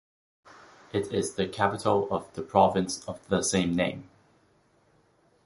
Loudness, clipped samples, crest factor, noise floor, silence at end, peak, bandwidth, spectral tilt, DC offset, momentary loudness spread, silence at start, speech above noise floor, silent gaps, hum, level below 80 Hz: -27 LUFS; under 0.1%; 22 dB; -65 dBFS; 1.4 s; -6 dBFS; 11.5 kHz; -4.5 dB/octave; under 0.1%; 10 LU; 0.95 s; 38 dB; none; none; -56 dBFS